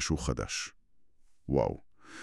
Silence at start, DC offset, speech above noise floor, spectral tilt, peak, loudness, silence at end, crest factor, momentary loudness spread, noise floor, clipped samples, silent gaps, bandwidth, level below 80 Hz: 0 s; under 0.1%; 27 dB; -4.5 dB/octave; -14 dBFS; -33 LUFS; 0 s; 20 dB; 19 LU; -59 dBFS; under 0.1%; none; 12.5 kHz; -46 dBFS